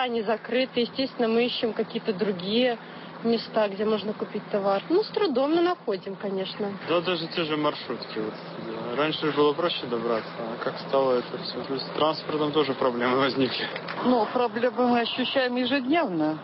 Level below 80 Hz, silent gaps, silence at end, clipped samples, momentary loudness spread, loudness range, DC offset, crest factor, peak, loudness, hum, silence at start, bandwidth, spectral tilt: -72 dBFS; none; 0 s; under 0.1%; 8 LU; 3 LU; under 0.1%; 14 dB; -10 dBFS; -26 LUFS; none; 0 s; 5.8 kHz; -9.5 dB/octave